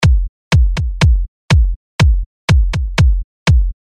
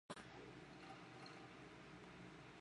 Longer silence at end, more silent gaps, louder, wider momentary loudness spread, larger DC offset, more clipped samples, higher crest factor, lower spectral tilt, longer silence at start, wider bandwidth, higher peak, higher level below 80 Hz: first, 0.25 s vs 0 s; first, 0.29-0.51 s, 1.28-1.48 s, 1.76-1.99 s, 2.26-2.48 s, 3.24-3.46 s vs none; first, -15 LUFS vs -58 LUFS; about the same, 4 LU vs 3 LU; neither; neither; second, 12 dB vs 20 dB; about the same, -5.5 dB/octave vs -4.5 dB/octave; about the same, 0 s vs 0.1 s; about the same, 10.5 kHz vs 11 kHz; first, -2 dBFS vs -38 dBFS; first, -14 dBFS vs -78 dBFS